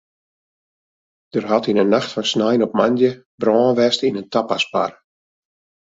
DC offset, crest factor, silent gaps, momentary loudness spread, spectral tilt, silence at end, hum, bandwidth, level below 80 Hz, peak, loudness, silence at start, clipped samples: under 0.1%; 18 dB; 3.26-3.38 s; 7 LU; -5 dB/octave; 1 s; none; 7.8 kHz; -62 dBFS; -2 dBFS; -18 LUFS; 1.35 s; under 0.1%